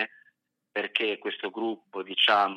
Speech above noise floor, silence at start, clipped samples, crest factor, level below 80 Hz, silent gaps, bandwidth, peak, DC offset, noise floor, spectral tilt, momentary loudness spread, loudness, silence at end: 41 dB; 0 s; under 0.1%; 22 dB; -90 dBFS; none; 10 kHz; -8 dBFS; under 0.1%; -69 dBFS; -3.5 dB/octave; 12 LU; -28 LUFS; 0 s